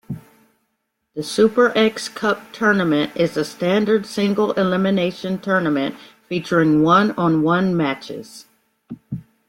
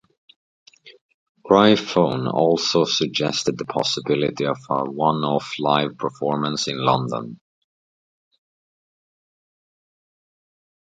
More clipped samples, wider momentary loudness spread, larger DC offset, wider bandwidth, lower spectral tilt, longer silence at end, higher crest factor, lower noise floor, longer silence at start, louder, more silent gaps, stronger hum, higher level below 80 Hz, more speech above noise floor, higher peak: neither; first, 18 LU vs 9 LU; neither; first, 16.5 kHz vs 9.4 kHz; about the same, -6 dB/octave vs -5 dB/octave; second, 0.25 s vs 3.6 s; about the same, 18 dB vs 22 dB; second, -73 dBFS vs under -90 dBFS; second, 0.1 s vs 0.85 s; first, -18 LUFS vs -21 LUFS; second, none vs 1.01-1.35 s; neither; about the same, -58 dBFS vs -62 dBFS; second, 55 dB vs over 70 dB; about the same, -2 dBFS vs 0 dBFS